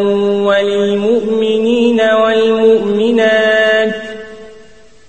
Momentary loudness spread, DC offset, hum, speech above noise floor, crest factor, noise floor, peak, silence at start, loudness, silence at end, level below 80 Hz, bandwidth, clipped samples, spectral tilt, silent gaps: 7 LU; 0.9%; none; 31 dB; 12 dB; -43 dBFS; 0 dBFS; 0 s; -12 LUFS; 0.55 s; -52 dBFS; 8.6 kHz; under 0.1%; -5.5 dB/octave; none